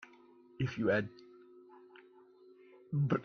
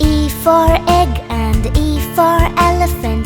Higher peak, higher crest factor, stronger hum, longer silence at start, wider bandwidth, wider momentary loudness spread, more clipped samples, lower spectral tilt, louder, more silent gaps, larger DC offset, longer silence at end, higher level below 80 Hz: second, -18 dBFS vs 0 dBFS; first, 20 dB vs 12 dB; neither; about the same, 0 s vs 0 s; second, 6.6 kHz vs 20 kHz; first, 26 LU vs 5 LU; neither; first, -8.5 dB/octave vs -6 dB/octave; second, -35 LUFS vs -13 LUFS; neither; neither; about the same, 0 s vs 0 s; second, -68 dBFS vs -18 dBFS